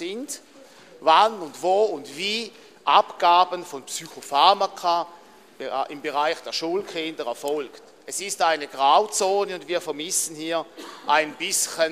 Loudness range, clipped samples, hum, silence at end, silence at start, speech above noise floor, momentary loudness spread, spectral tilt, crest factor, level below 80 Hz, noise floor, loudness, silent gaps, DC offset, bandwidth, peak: 6 LU; under 0.1%; none; 0 s; 0 s; 26 dB; 14 LU; -1 dB/octave; 20 dB; -74 dBFS; -49 dBFS; -23 LUFS; none; under 0.1%; 15 kHz; -4 dBFS